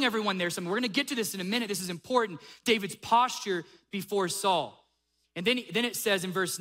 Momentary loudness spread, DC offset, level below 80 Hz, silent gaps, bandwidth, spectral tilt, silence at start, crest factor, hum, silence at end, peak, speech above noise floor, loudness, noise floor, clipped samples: 7 LU; under 0.1%; -74 dBFS; none; 16 kHz; -3 dB/octave; 0 s; 20 dB; none; 0 s; -10 dBFS; 46 dB; -29 LUFS; -75 dBFS; under 0.1%